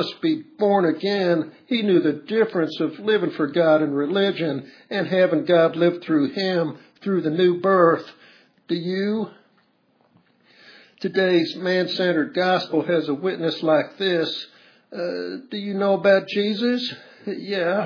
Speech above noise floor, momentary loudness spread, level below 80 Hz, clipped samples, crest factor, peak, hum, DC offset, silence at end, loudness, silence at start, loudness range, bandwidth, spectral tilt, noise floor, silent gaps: 42 dB; 12 LU; -82 dBFS; under 0.1%; 18 dB; -4 dBFS; none; under 0.1%; 0 s; -22 LUFS; 0 s; 4 LU; 5.4 kHz; -7 dB/octave; -63 dBFS; none